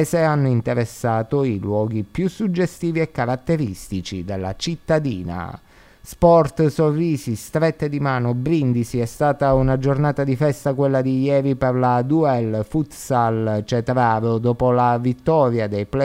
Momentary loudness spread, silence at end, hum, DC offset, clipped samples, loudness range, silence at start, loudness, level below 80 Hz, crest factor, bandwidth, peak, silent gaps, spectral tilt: 8 LU; 0 s; none; under 0.1%; under 0.1%; 4 LU; 0 s; -20 LUFS; -42 dBFS; 18 dB; 16 kHz; 0 dBFS; none; -7.5 dB/octave